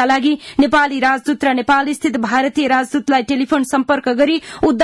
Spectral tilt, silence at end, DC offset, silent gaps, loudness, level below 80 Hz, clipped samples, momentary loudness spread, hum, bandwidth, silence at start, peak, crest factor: -4 dB/octave; 0 s; under 0.1%; none; -16 LUFS; -50 dBFS; under 0.1%; 3 LU; none; 12 kHz; 0 s; -4 dBFS; 12 dB